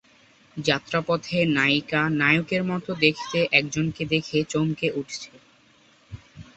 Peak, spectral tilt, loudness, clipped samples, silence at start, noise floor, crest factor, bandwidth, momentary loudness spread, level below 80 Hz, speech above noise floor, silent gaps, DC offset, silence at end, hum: -2 dBFS; -5 dB/octave; -23 LUFS; under 0.1%; 0.55 s; -58 dBFS; 22 dB; 8.2 kHz; 14 LU; -56 dBFS; 34 dB; none; under 0.1%; 0.15 s; none